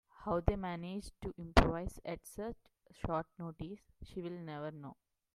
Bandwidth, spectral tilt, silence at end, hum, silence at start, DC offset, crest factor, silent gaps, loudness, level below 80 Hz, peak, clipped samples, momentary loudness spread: 15 kHz; -6.5 dB/octave; 0.4 s; none; 0.2 s; under 0.1%; 30 dB; none; -39 LUFS; -44 dBFS; -8 dBFS; under 0.1%; 18 LU